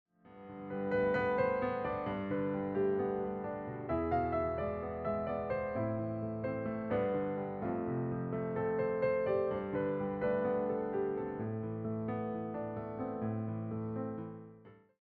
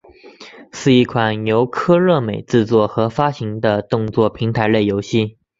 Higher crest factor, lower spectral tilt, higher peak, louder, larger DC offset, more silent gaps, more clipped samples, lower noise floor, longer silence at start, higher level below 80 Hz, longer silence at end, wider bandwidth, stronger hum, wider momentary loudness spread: about the same, 14 dB vs 16 dB; about the same, -7.5 dB/octave vs -7 dB/octave; second, -20 dBFS vs -2 dBFS; second, -36 LUFS vs -17 LUFS; neither; neither; neither; first, -58 dBFS vs -41 dBFS; about the same, 0.25 s vs 0.25 s; second, -62 dBFS vs -48 dBFS; about the same, 0.3 s vs 0.3 s; second, 4.6 kHz vs 7.8 kHz; neither; about the same, 8 LU vs 6 LU